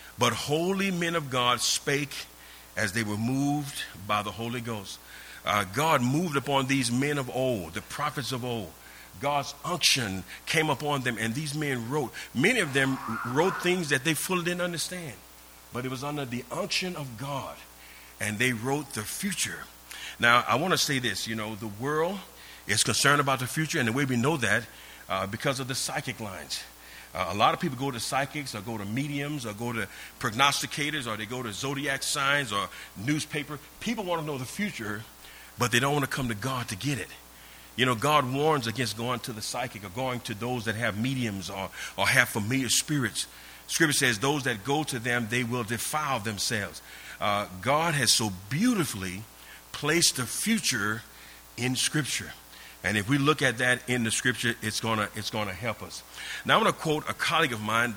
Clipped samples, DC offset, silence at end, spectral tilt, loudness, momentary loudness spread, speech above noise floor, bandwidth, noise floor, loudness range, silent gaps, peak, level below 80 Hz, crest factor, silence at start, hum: under 0.1%; under 0.1%; 0 s; -3.5 dB/octave; -28 LUFS; 14 LU; 22 dB; over 20 kHz; -50 dBFS; 4 LU; none; -4 dBFS; -58 dBFS; 24 dB; 0 s; none